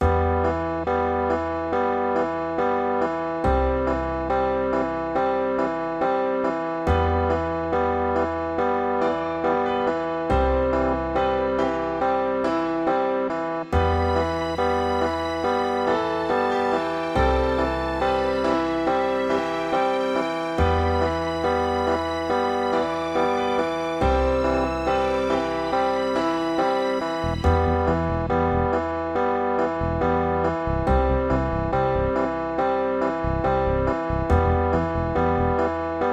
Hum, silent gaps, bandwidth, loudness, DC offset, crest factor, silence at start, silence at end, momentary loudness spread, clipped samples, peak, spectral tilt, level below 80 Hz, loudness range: none; none; 10.5 kHz; -23 LUFS; under 0.1%; 14 dB; 0 s; 0 s; 3 LU; under 0.1%; -8 dBFS; -7 dB/octave; -34 dBFS; 1 LU